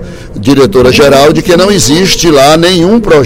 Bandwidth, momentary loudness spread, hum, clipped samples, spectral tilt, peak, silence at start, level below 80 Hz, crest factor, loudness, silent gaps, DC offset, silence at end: 17.5 kHz; 4 LU; none; 6%; -4.5 dB/octave; 0 dBFS; 0 s; -26 dBFS; 6 dB; -5 LUFS; none; under 0.1%; 0 s